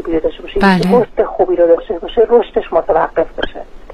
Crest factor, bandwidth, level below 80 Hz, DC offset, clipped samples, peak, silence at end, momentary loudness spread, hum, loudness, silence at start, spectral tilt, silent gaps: 12 dB; 12 kHz; -32 dBFS; under 0.1%; under 0.1%; 0 dBFS; 0 s; 9 LU; none; -14 LUFS; 0 s; -7.5 dB/octave; none